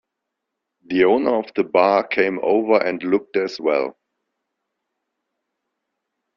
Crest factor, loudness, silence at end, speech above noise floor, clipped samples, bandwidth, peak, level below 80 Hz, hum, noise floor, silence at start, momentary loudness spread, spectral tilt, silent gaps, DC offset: 20 dB; -19 LUFS; 2.45 s; 62 dB; under 0.1%; 7 kHz; -2 dBFS; -64 dBFS; none; -80 dBFS; 0.9 s; 6 LU; -6.5 dB/octave; none; under 0.1%